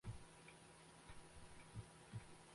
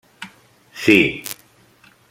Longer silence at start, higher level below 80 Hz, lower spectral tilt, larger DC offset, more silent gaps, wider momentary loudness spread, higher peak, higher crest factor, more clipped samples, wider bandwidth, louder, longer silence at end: second, 0.05 s vs 0.2 s; second, -68 dBFS vs -54 dBFS; about the same, -4.5 dB/octave vs -4.5 dB/octave; neither; neither; second, 5 LU vs 24 LU; second, -40 dBFS vs 0 dBFS; about the same, 18 dB vs 22 dB; neither; second, 11.5 kHz vs 16.5 kHz; second, -60 LUFS vs -16 LUFS; second, 0 s vs 0.8 s